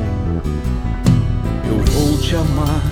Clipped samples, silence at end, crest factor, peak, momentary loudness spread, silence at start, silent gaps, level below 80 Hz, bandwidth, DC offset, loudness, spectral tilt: under 0.1%; 0 s; 16 dB; 0 dBFS; 6 LU; 0 s; none; -22 dBFS; 17 kHz; under 0.1%; -18 LUFS; -6.5 dB/octave